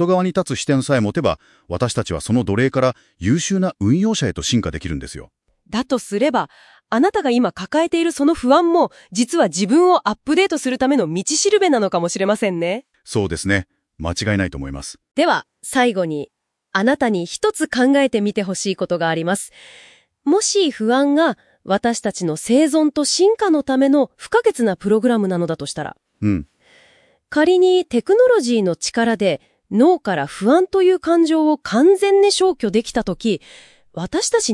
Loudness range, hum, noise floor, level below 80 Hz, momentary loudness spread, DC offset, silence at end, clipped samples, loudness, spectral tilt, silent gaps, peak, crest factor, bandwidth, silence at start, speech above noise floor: 4 LU; none; -55 dBFS; -48 dBFS; 11 LU; under 0.1%; 0 s; under 0.1%; -18 LUFS; -4.5 dB/octave; none; 0 dBFS; 18 dB; 12 kHz; 0 s; 37 dB